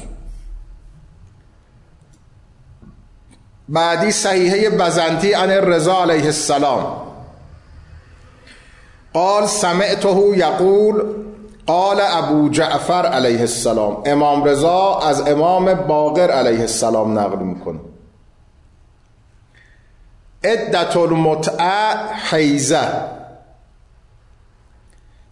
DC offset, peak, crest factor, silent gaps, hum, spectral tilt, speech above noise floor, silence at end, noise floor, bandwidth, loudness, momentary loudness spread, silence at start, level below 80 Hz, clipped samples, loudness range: under 0.1%; -6 dBFS; 12 dB; none; none; -4.5 dB/octave; 35 dB; 1.95 s; -50 dBFS; 11.5 kHz; -16 LUFS; 10 LU; 0 s; -44 dBFS; under 0.1%; 7 LU